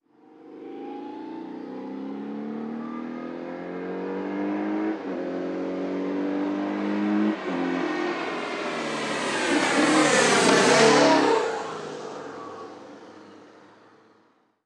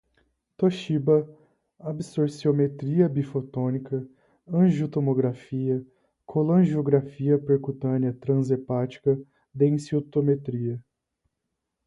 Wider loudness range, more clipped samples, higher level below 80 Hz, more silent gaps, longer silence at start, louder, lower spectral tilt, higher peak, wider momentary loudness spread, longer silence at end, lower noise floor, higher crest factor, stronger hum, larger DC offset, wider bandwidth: first, 15 LU vs 3 LU; neither; second, -76 dBFS vs -64 dBFS; neither; second, 0.35 s vs 0.6 s; about the same, -24 LUFS vs -25 LUFS; second, -3.5 dB/octave vs -9 dB/octave; about the same, -6 dBFS vs -6 dBFS; first, 19 LU vs 9 LU; about the same, 1.15 s vs 1.05 s; second, -63 dBFS vs -82 dBFS; about the same, 20 dB vs 18 dB; neither; neither; first, 12.5 kHz vs 11 kHz